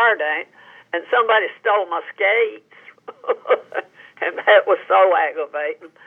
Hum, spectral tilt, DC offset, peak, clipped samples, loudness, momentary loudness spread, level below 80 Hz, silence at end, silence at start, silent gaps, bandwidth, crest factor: none; -4 dB/octave; under 0.1%; -2 dBFS; under 0.1%; -19 LUFS; 13 LU; under -90 dBFS; 0.2 s; 0 s; none; 4 kHz; 18 dB